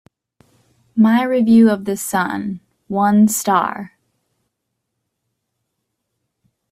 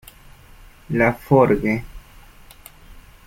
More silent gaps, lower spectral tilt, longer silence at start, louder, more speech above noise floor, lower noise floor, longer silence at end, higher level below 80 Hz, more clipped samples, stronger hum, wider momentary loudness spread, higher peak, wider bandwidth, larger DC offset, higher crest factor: neither; second, -5.5 dB/octave vs -8 dB/octave; about the same, 0.95 s vs 0.9 s; first, -16 LUFS vs -19 LUFS; first, 61 dB vs 28 dB; first, -76 dBFS vs -45 dBFS; first, 2.85 s vs 0.25 s; second, -62 dBFS vs -42 dBFS; neither; neither; first, 16 LU vs 11 LU; about the same, -2 dBFS vs -2 dBFS; about the same, 15.5 kHz vs 16.5 kHz; neither; about the same, 16 dB vs 20 dB